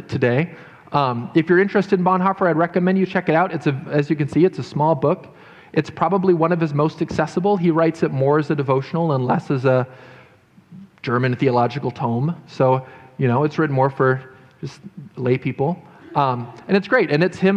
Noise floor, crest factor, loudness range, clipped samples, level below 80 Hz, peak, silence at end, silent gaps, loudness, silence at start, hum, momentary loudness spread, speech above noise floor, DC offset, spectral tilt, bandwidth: -51 dBFS; 16 dB; 4 LU; under 0.1%; -56 dBFS; -4 dBFS; 0 s; none; -19 LUFS; 0 s; none; 9 LU; 32 dB; under 0.1%; -8 dB/octave; 8.8 kHz